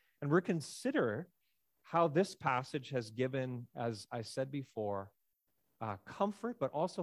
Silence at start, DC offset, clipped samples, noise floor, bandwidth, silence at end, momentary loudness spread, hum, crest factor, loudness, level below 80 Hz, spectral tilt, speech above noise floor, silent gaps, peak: 0.2 s; under 0.1%; under 0.1%; -82 dBFS; 15.5 kHz; 0 s; 11 LU; none; 20 dB; -37 LUFS; -76 dBFS; -6 dB/octave; 45 dB; none; -18 dBFS